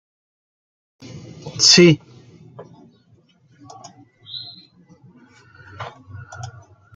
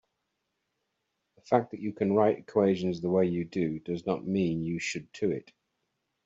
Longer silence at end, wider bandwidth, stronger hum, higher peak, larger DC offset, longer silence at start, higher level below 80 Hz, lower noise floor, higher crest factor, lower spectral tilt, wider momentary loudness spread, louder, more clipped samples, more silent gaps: second, 0.5 s vs 0.85 s; first, 9.4 kHz vs 8 kHz; neither; first, 0 dBFS vs -8 dBFS; neither; second, 1.15 s vs 1.45 s; first, -62 dBFS vs -68 dBFS; second, -56 dBFS vs -81 dBFS; about the same, 24 dB vs 22 dB; second, -3.5 dB/octave vs -6.5 dB/octave; first, 29 LU vs 7 LU; first, -12 LUFS vs -29 LUFS; neither; neither